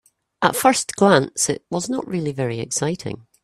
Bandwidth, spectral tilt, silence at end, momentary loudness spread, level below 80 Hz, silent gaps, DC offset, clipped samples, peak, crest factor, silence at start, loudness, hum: 16 kHz; -4 dB/octave; 0.25 s; 10 LU; -58 dBFS; none; under 0.1%; under 0.1%; 0 dBFS; 20 dB; 0.4 s; -20 LUFS; none